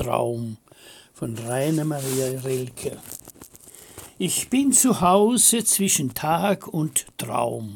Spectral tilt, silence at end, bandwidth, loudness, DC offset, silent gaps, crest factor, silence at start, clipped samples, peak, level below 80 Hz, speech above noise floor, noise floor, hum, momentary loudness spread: -3.5 dB/octave; 0 s; 18 kHz; -21 LUFS; under 0.1%; none; 20 dB; 0 s; under 0.1%; -4 dBFS; -56 dBFS; 24 dB; -47 dBFS; none; 20 LU